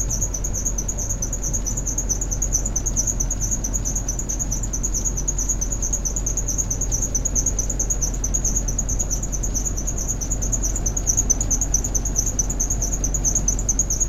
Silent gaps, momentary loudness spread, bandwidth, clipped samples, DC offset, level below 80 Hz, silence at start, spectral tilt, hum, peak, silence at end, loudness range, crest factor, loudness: none; 4 LU; 14.5 kHz; under 0.1%; under 0.1%; -26 dBFS; 0 s; -3.5 dB/octave; none; -4 dBFS; 0 s; 2 LU; 18 dB; -22 LUFS